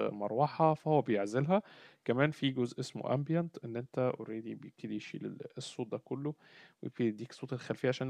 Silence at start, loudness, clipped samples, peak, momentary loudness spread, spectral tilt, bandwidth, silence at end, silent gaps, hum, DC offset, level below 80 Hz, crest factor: 0 s; -35 LUFS; under 0.1%; -12 dBFS; 13 LU; -7 dB/octave; 10.5 kHz; 0 s; none; none; under 0.1%; -78 dBFS; 22 dB